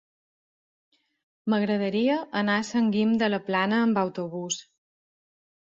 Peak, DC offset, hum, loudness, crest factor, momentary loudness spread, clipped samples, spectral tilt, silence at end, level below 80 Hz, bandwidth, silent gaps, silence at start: -12 dBFS; under 0.1%; none; -26 LUFS; 16 dB; 9 LU; under 0.1%; -5 dB/octave; 1 s; -70 dBFS; 7.8 kHz; none; 1.45 s